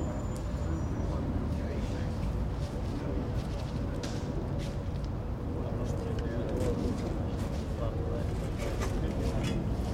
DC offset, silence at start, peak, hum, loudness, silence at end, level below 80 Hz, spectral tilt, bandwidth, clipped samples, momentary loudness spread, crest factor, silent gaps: under 0.1%; 0 s; -18 dBFS; none; -34 LUFS; 0 s; -38 dBFS; -7 dB/octave; 15.5 kHz; under 0.1%; 3 LU; 14 dB; none